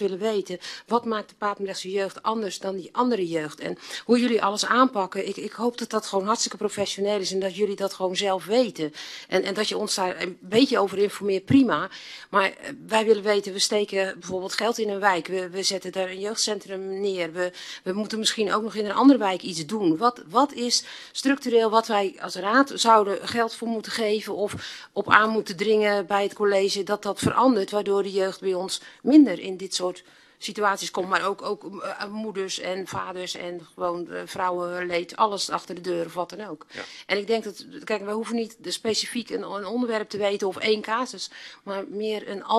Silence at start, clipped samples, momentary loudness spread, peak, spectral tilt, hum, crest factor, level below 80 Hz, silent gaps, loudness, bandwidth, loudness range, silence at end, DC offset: 0 s; under 0.1%; 12 LU; 0 dBFS; -3.5 dB/octave; none; 24 dB; -68 dBFS; none; -25 LUFS; 13 kHz; 6 LU; 0 s; under 0.1%